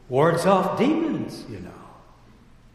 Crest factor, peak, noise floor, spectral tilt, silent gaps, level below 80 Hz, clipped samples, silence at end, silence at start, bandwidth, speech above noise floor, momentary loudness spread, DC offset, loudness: 18 dB; -6 dBFS; -51 dBFS; -6.5 dB/octave; none; -54 dBFS; under 0.1%; 0.85 s; 0.1 s; 14 kHz; 29 dB; 19 LU; under 0.1%; -22 LUFS